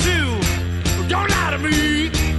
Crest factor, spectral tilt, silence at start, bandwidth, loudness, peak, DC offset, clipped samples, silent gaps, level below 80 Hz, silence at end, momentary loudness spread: 14 dB; -4 dB/octave; 0 s; 12.5 kHz; -19 LUFS; -4 dBFS; under 0.1%; under 0.1%; none; -26 dBFS; 0 s; 4 LU